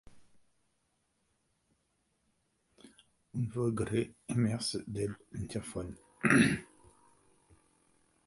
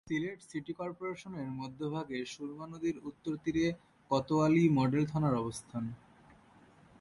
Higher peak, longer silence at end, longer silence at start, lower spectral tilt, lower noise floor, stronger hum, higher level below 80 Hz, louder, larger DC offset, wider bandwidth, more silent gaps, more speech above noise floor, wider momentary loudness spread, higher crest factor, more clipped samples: first, -10 dBFS vs -16 dBFS; first, 1.6 s vs 1.05 s; about the same, 0.15 s vs 0.05 s; second, -5.5 dB/octave vs -7 dB/octave; first, -78 dBFS vs -61 dBFS; neither; about the same, -60 dBFS vs -64 dBFS; about the same, -33 LUFS vs -34 LUFS; neither; about the same, 11.5 kHz vs 11.5 kHz; neither; first, 46 dB vs 28 dB; about the same, 16 LU vs 14 LU; first, 26 dB vs 18 dB; neither